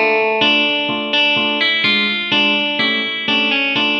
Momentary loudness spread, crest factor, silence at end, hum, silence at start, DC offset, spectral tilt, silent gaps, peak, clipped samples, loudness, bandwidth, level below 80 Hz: 3 LU; 14 dB; 0 s; none; 0 s; under 0.1%; -4 dB/octave; none; -2 dBFS; under 0.1%; -14 LUFS; 8.2 kHz; -70 dBFS